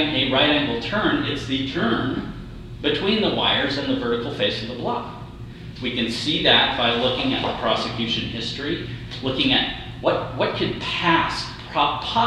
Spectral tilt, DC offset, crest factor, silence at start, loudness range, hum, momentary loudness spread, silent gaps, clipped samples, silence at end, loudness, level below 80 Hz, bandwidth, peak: -5 dB/octave; under 0.1%; 20 dB; 0 s; 3 LU; none; 11 LU; none; under 0.1%; 0 s; -21 LUFS; -42 dBFS; 12 kHz; -2 dBFS